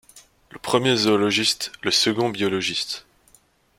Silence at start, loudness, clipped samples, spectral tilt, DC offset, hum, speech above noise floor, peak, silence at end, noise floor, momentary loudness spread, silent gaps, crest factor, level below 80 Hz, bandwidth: 0.15 s; -21 LUFS; under 0.1%; -3 dB/octave; under 0.1%; none; 37 dB; -4 dBFS; 0.8 s; -58 dBFS; 9 LU; none; 20 dB; -60 dBFS; 16.5 kHz